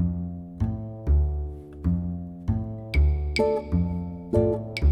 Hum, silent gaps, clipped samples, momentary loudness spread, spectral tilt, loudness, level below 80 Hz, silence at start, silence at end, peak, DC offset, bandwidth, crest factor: none; none; under 0.1%; 9 LU; -8 dB/octave; -27 LUFS; -28 dBFS; 0 s; 0 s; -10 dBFS; under 0.1%; 9.2 kHz; 14 dB